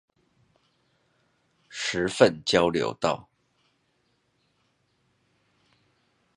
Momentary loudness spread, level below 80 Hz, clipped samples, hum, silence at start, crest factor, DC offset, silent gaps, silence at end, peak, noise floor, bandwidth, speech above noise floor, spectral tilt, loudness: 12 LU; -60 dBFS; under 0.1%; none; 1.7 s; 28 dB; under 0.1%; none; 3.15 s; -4 dBFS; -71 dBFS; 11 kHz; 48 dB; -4 dB/octave; -25 LUFS